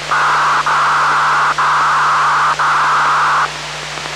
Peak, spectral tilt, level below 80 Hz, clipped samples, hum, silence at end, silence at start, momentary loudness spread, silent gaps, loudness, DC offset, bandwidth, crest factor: -4 dBFS; -1.5 dB/octave; -46 dBFS; under 0.1%; none; 0 s; 0 s; 5 LU; none; -12 LUFS; under 0.1%; 14.5 kHz; 10 dB